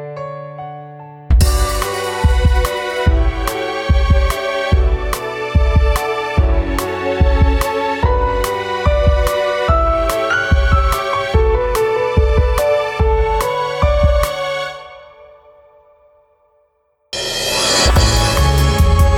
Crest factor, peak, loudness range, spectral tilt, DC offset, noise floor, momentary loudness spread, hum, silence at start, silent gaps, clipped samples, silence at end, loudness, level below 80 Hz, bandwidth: 12 dB; -2 dBFS; 5 LU; -5 dB/octave; under 0.1%; -61 dBFS; 8 LU; none; 0 s; none; under 0.1%; 0 s; -16 LUFS; -18 dBFS; 17 kHz